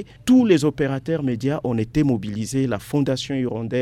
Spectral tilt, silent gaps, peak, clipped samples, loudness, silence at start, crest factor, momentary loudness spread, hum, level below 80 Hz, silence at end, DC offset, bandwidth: -6.5 dB/octave; none; -4 dBFS; under 0.1%; -21 LUFS; 0 s; 18 dB; 8 LU; none; -48 dBFS; 0 s; under 0.1%; 13.5 kHz